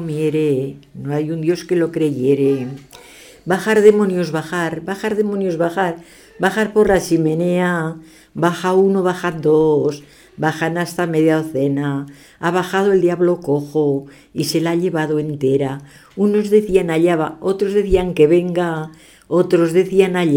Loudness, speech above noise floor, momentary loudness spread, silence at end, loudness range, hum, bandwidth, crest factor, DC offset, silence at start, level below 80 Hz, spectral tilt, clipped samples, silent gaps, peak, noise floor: -17 LUFS; 25 dB; 10 LU; 0 s; 2 LU; none; 19 kHz; 16 dB; under 0.1%; 0 s; -42 dBFS; -6.5 dB/octave; under 0.1%; none; 0 dBFS; -42 dBFS